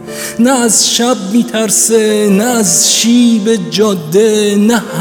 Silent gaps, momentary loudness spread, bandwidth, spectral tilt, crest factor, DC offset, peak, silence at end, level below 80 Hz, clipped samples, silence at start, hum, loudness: none; 5 LU; over 20 kHz; -3 dB/octave; 10 dB; under 0.1%; 0 dBFS; 0 s; -54 dBFS; under 0.1%; 0 s; none; -9 LUFS